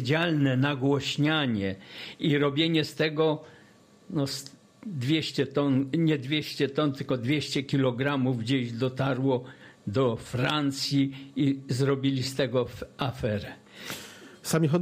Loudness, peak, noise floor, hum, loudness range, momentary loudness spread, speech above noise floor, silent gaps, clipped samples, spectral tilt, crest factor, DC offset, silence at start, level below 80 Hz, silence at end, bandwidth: -27 LUFS; -12 dBFS; -56 dBFS; none; 2 LU; 13 LU; 29 dB; none; under 0.1%; -6 dB/octave; 16 dB; under 0.1%; 0 s; -60 dBFS; 0 s; 15.5 kHz